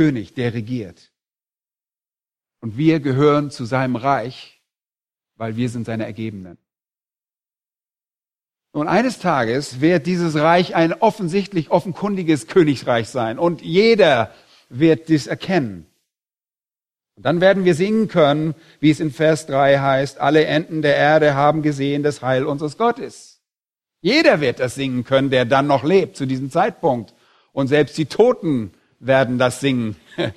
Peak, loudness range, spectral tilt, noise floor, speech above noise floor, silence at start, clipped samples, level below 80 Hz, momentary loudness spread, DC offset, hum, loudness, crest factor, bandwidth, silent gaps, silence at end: 0 dBFS; 8 LU; -6.5 dB/octave; under -90 dBFS; over 72 dB; 0 s; under 0.1%; -58 dBFS; 11 LU; under 0.1%; none; -18 LUFS; 18 dB; 13 kHz; none; 0.05 s